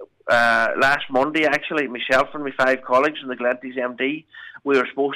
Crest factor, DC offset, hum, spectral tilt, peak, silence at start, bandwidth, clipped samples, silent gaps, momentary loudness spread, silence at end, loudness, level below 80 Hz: 12 dB; under 0.1%; none; -4 dB/octave; -8 dBFS; 0 s; 14 kHz; under 0.1%; none; 8 LU; 0 s; -20 LUFS; -58 dBFS